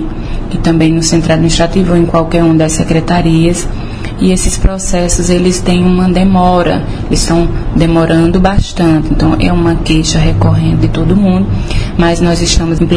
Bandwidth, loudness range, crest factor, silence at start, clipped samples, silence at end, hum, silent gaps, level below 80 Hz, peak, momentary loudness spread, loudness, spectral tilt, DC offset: 10.5 kHz; 1 LU; 10 dB; 0 s; 0.2%; 0 s; none; none; -16 dBFS; 0 dBFS; 5 LU; -10 LUFS; -5.5 dB/octave; 1%